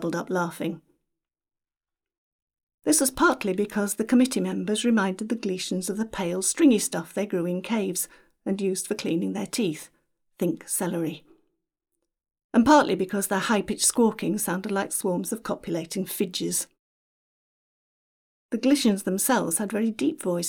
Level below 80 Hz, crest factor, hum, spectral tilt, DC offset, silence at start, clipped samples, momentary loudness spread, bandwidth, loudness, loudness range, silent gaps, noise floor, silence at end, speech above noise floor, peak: -60 dBFS; 20 dB; none; -4 dB/octave; under 0.1%; 0 s; under 0.1%; 10 LU; over 20 kHz; -25 LUFS; 6 LU; 2.18-2.47 s, 2.63-2.67 s, 2.74-2.78 s, 12.44-12.49 s, 16.79-18.49 s; under -90 dBFS; 0 s; over 65 dB; -6 dBFS